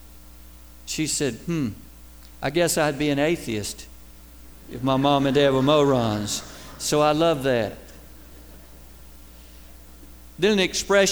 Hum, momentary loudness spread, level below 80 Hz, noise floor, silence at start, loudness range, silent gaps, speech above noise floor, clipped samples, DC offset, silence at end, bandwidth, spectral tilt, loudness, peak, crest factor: none; 14 LU; -46 dBFS; -46 dBFS; 0.05 s; 7 LU; none; 24 dB; under 0.1%; 0.3%; 0 s; over 20 kHz; -4.5 dB/octave; -22 LUFS; -6 dBFS; 18 dB